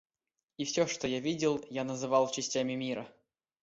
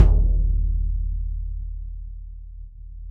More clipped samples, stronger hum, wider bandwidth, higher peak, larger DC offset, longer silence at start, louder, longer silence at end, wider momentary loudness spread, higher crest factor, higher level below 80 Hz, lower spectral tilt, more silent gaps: neither; neither; first, 8 kHz vs 1.7 kHz; second, -14 dBFS vs -2 dBFS; neither; first, 0.6 s vs 0 s; second, -33 LUFS vs -26 LUFS; first, 0.5 s vs 0 s; second, 9 LU vs 20 LU; about the same, 20 dB vs 20 dB; second, -70 dBFS vs -22 dBFS; second, -4 dB/octave vs -10 dB/octave; neither